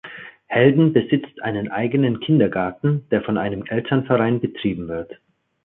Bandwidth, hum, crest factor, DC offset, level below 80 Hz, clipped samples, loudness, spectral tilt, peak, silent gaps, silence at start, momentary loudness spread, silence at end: 4 kHz; none; 18 dB; under 0.1%; -52 dBFS; under 0.1%; -20 LUFS; -12 dB/octave; -2 dBFS; none; 0.05 s; 11 LU; 0.5 s